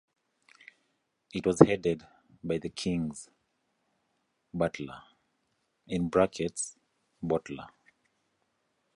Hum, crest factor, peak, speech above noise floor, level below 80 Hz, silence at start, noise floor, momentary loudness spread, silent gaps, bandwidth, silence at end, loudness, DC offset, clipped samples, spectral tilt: none; 32 dB; -2 dBFS; 48 dB; -58 dBFS; 1.35 s; -77 dBFS; 21 LU; none; 11.5 kHz; 1.3 s; -30 LUFS; under 0.1%; under 0.1%; -6 dB/octave